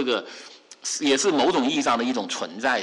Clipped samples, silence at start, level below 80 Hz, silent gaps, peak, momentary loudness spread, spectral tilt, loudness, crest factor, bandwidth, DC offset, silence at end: under 0.1%; 0 s; -66 dBFS; none; -12 dBFS; 17 LU; -2 dB/octave; -23 LUFS; 12 dB; 11.5 kHz; under 0.1%; 0 s